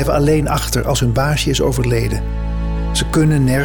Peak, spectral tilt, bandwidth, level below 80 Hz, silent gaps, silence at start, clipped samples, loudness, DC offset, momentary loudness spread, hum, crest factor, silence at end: -6 dBFS; -5.5 dB/octave; 19.5 kHz; -22 dBFS; none; 0 s; under 0.1%; -16 LUFS; under 0.1%; 8 LU; none; 10 dB; 0 s